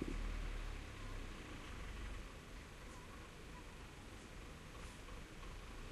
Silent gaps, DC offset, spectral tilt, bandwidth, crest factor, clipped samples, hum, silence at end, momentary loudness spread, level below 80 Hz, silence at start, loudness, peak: none; under 0.1%; -4.5 dB/octave; 13 kHz; 20 dB; under 0.1%; none; 0 s; 7 LU; -50 dBFS; 0 s; -53 LUFS; -30 dBFS